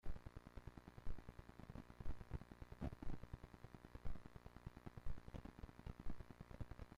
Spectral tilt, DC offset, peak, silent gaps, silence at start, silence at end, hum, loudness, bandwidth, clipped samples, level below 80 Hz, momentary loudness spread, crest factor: -7.5 dB/octave; under 0.1%; -34 dBFS; none; 0.05 s; 0 s; none; -58 LUFS; 7 kHz; under 0.1%; -56 dBFS; 7 LU; 16 dB